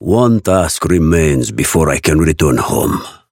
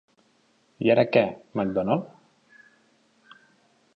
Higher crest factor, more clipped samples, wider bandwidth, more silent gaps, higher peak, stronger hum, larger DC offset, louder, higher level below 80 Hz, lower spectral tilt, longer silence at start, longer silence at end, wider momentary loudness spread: second, 12 dB vs 22 dB; neither; first, 17 kHz vs 6.2 kHz; neither; first, 0 dBFS vs -6 dBFS; neither; neither; first, -13 LUFS vs -24 LUFS; first, -26 dBFS vs -64 dBFS; second, -5.5 dB/octave vs -8.5 dB/octave; second, 0 s vs 0.8 s; second, 0.2 s vs 1.9 s; second, 4 LU vs 9 LU